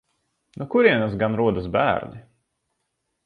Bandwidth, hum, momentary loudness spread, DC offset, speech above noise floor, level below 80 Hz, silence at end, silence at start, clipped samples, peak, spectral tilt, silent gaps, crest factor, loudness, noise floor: 4.9 kHz; none; 12 LU; under 0.1%; 55 dB; -50 dBFS; 1.05 s; 0.55 s; under 0.1%; -2 dBFS; -8.5 dB/octave; none; 20 dB; -21 LUFS; -76 dBFS